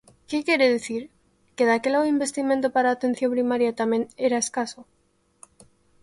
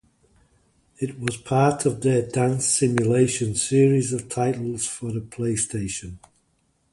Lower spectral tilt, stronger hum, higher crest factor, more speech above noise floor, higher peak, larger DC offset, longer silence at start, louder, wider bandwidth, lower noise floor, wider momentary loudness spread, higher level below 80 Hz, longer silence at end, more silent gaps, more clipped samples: second, -3 dB/octave vs -5 dB/octave; neither; about the same, 16 dB vs 18 dB; about the same, 43 dB vs 45 dB; about the same, -8 dBFS vs -6 dBFS; neither; second, 0.3 s vs 1 s; about the same, -23 LUFS vs -23 LUFS; about the same, 11.5 kHz vs 11.5 kHz; about the same, -66 dBFS vs -67 dBFS; about the same, 10 LU vs 11 LU; second, -66 dBFS vs -52 dBFS; first, 1.2 s vs 0.75 s; neither; neither